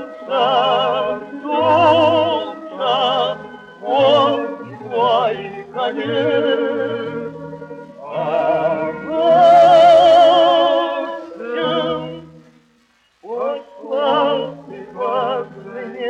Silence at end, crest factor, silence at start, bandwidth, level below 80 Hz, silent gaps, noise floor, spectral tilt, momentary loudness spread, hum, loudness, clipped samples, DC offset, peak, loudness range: 0 s; 16 dB; 0 s; 8.2 kHz; -62 dBFS; none; -58 dBFS; -5.5 dB/octave; 20 LU; none; -16 LUFS; under 0.1%; under 0.1%; -2 dBFS; 10 LU